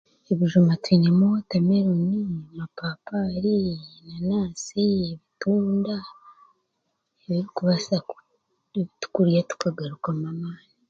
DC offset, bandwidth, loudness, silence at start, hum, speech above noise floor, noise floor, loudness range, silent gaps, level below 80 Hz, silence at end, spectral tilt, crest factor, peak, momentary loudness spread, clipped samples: under 0.1%; 7.6 kHz; -24 LUFS; 0.3 s; none; 53 dB; -76 dBFS; 6 LU; none; -58 dBFS; 0.35 s; -7 dB/octave; 18 dB; -6 dBFS; 14 LU; under 0.1%